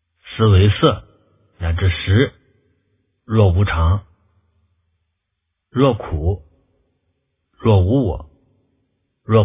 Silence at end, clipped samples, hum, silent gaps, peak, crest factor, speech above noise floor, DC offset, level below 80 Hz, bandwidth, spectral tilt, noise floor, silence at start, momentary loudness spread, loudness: 0 s; under 0.1%; none; none; 0 dBFS; 18 dB; 61 dB; under 0.1%; -28 dBFS; 3.8 kHz; -11.5 dB/octave; -76 dBFS; 0.25 s; 13 LU; -17 LUFS